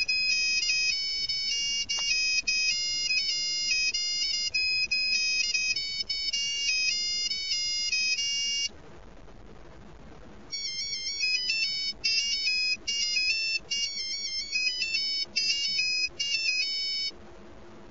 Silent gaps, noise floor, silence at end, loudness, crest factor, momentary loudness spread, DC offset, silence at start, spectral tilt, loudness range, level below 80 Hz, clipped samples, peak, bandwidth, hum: none; -49 dBFS; 0 s; -26 LUFS; 16 dB; 5 LU; 0.4%; 0 s; 2 dB/octave; 5 LU; -58 dBFS; under 0.1%; -12 dBFS; 8 kHz; none